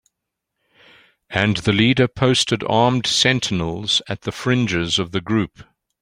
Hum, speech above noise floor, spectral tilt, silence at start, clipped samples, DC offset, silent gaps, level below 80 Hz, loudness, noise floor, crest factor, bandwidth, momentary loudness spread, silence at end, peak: none; 61 dB; -4.5 dB/octave; 1.3 s; under 0.1%; under 0.1%; none; -48 dBFS; -18 LUFS; -80 dBFS; 18 dB; 15.5 kHz; 7 LU; 0.4 s; -2 dBFS